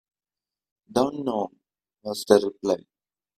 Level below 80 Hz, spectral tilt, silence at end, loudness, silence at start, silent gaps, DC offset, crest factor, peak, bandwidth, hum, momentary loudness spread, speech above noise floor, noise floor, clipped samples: -64 dBFS; -5 dB/octave; 0.6 s; -25 LUFS; 0.9 s; none; under 0.1%; 26 dB; -2 dBFS; 15.5 kHz; none; 14 LU; over 67 dB; under -90 dBFS; under 0.1%